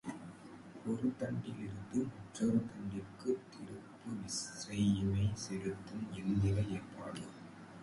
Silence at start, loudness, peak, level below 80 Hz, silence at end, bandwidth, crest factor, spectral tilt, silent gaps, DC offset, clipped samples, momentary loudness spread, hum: 0.05 s; -39 LUFS; -22 dBFS; -58 dBFS; 0 s; 11.5 kHz; 18 dB; -6 dB/octave; none; under 0.1%; under 0.1%; 16 LU; none